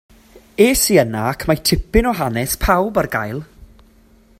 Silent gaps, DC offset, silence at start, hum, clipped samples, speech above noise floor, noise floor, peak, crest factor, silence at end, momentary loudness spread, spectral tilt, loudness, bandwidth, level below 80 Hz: none; under 0.1%; 0.35 s; none; under 0.1%; 34 dB; -50 dBFS; 0 dBFS; 18 dB; 0.95 s; 9 LU; -4 dB/octave; -17 LUFS; 16.5 kHz; -30 dBFS